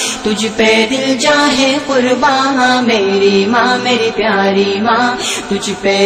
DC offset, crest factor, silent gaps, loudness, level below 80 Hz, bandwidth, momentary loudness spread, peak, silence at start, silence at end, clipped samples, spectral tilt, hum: under 0.1%; 10 dB; none; -12 LUFS; -46 dBFS; 15.5 kHz; 5 LU; -2 dBFS; 0 s; 0 s; under 0.1%; -3.5 dB/octave; none